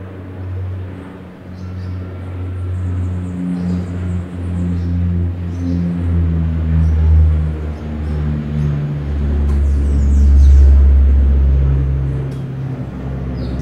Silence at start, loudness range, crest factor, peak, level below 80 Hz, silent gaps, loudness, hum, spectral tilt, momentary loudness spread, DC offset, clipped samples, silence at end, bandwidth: 0 s; 10 LU; 14 dB; 0 dBFS; -16 dBFS; none; -17 LUFS; none; -9.5 dB/octave; 15 LU; under 0.1%; under 0.1%; 0 s; 4.3 kHz